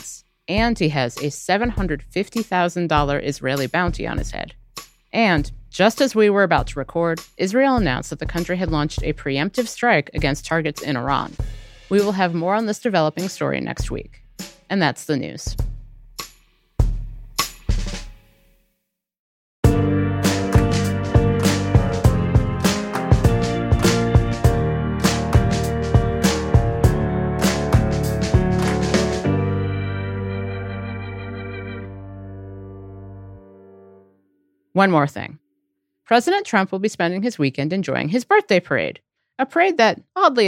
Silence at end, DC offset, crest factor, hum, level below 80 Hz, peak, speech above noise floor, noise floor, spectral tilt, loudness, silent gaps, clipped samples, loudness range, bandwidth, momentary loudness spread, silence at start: 0 s; under 0.1%; 18 dB; none; -30 dBFS; -2 dBFS; 55 dB; -75 dBFS; -5.5 dB/octave; -20 LUFS; 19.19-19.63 s; under 0.1%; 9 LU; 16.5 kHz; 15 LU; 0 s